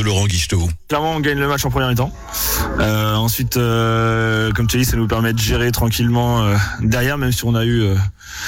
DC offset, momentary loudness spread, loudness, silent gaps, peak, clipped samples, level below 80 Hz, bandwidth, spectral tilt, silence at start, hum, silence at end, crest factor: under 0.1%; 3 LU; -17 LUFS; none; -6 dBFS; under 0.1%; -30 dBFS; 16.5 kHz; -5 dB/octave; 0 s; none; 0 s; 10 dB